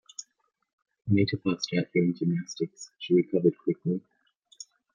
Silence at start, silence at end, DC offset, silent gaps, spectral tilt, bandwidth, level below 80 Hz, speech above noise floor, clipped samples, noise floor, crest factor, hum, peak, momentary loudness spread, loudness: 0.2 s; 0.3 s; under 0.1%; 0.73-0.78 s, 4.36-4.41 s; -6.5 dB/octave; 7.4 kHz; -68 dBFS; 47 dB; under 0.1%; -74 dBFS; 18 dB; none; -10 dBFS; 18 LU; -28 LUFS